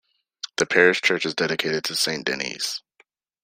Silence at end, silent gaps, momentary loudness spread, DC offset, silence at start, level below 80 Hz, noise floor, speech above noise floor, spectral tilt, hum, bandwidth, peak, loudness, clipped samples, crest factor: 0.65 s; none; 13 LU; under 0.1%; 0.45 s; -66 dBFS; -62 dBFS; 40 dB; -2.5 dB/octave; none; 16 kHz; -2 dBFS; -22 LUFS; under 0.1%; 22 dB